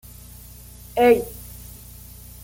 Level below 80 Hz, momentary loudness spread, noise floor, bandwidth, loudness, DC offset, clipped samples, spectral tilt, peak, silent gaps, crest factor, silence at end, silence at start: -44 dBFS; 25 LU; -42 dBFS; 17 kHz; -19 LUFS; under 0.1%; under 0.1%; -5 dB/octave; -4 dBFS; none; 20 dB; 0.8 s; 0.95 s